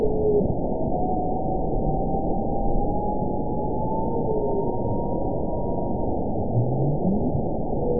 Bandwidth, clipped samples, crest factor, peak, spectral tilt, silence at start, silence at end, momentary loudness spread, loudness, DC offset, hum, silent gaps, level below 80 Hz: 1 kHz; under 0.1%; 14 dB; -10 dBFS; -19 dB/octave; 0 s; 0 s; 4 LU; -25 LUFS; 4%; none; none; -32 dBFS